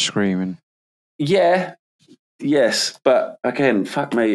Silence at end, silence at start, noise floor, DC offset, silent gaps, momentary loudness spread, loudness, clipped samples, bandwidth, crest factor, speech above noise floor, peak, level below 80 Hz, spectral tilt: 0 s; 0 s; under -90 dBFS; under 0.1%; 0.63-1.19 s, 1.79-1.99 s, 2.19-2.39 s; 12 LU; -19 LUFS; under 0.1%; 13 kHz; 16 dB; over 72 dB; -2 dBFS; -70 dBFS; -4.5 dB/octave